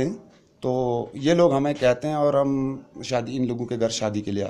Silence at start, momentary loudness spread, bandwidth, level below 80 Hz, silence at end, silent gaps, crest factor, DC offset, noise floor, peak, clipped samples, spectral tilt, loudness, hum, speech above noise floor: 0 s; 10 LU; 11.5 kHz; -54 dBFS; 0 s; none; 16 dB; under 0.1%; -46 dBFS; -6 dBFS; under 0.1%; -6 dB/octave; -24 LUFS; none; 24 dB